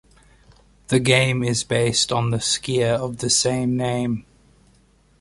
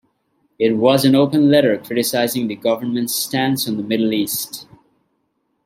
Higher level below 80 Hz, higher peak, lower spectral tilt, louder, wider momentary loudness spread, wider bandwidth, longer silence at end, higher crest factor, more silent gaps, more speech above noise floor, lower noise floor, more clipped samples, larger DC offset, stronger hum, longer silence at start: first, -50 dBFS vs -62 dBFS; about the same, -2 dBFS vs -2 dBFS; about the same, -4 dB/octave vs -4.5 dB/octave; second, -20 LUFS vs -17 LUFS; about the same, 6 LU vs 7 LU; second, 11.5 kHz vs 16.5 kHz; about the same, 1 s vs 1 s; about the same, 20 dB vs 18 dB; neither; second, 36 dB vs 52 dB; second, -57 dBFS vs -69 dBFS; neither; neither; neither; first, 0.9 s vs 0.6 s